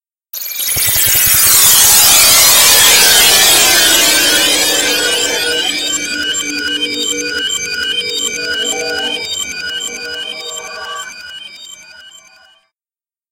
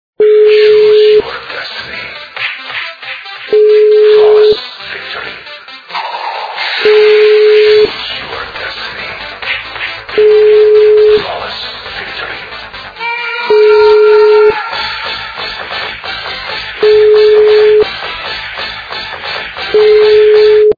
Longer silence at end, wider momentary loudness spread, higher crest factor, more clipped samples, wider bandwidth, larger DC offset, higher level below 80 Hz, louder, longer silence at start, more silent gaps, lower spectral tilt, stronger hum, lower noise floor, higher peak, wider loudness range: first, 1.2 s vs 0.05 s; first, 19 LU vs 15 LU; about the same, 12 dB vs 10 dB; about the same, 0.3% vs 0.3%; first, over 20 kHz vs 5 kHz; neither; about the same, -44 dBFS vs -44 dBFS; about the same, -8 LUFS vs -9 LUFS; first, 0.35 s vs 0.2 s; neither; second, 1 dB/octave vs -4.5 dB/octave; neither; first, under -90 dBFS vs -29 dBFS; about the same, 0 dBFS vs 0 dBFS; first, 17 LU vs 2 LU